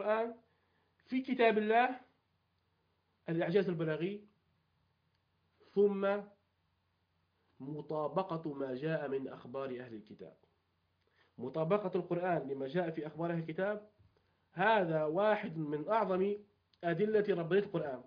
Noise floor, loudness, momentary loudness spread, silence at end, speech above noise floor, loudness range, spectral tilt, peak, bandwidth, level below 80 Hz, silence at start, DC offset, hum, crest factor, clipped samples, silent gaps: -79 dBFS; -35 LUFS; 14 LU; 0.05 s; 44 dB; 6 LU; -5 dB/octave; -16 dBFS; 5.2 kHz; -80 dBFS; 0 s; under 0.1%; none; 20 dB; under 0.1%; none